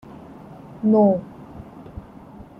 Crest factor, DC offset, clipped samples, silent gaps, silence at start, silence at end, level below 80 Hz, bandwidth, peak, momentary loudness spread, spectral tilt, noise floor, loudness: 16 dB; under 0.1%; under 0.1%; none; 0.3 s; 0.15 s; -52 dBFS; 3.2 kHz; -8 dBFS; 25 LU; -11.5 dB/octave; -42 dBFS; -19 LUFS